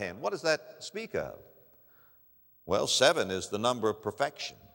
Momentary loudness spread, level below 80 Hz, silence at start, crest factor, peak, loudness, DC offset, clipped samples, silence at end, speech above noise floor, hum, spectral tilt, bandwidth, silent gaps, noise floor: 16 LU; -66 dBFS; 0 s; 24 dB; -8 dBFS; -30 LUFS; under 0.1%; under 0.1%; 0.2 s; 31 dB; none; -2.5 dB/octave; 16 kHz; none; -62 dBFS